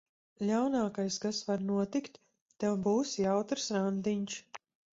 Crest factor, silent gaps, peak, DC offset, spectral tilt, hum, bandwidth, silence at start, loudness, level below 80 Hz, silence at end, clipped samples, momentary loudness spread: 16 dB; 2.42-2.46 s; -18 dBFS; under 0.1%; -5 dB/octave; none; 7.8 kHz; 0.4 s; -33 LUFS; -72 dBFS; 0.4 s; under 0.1%; 10 LU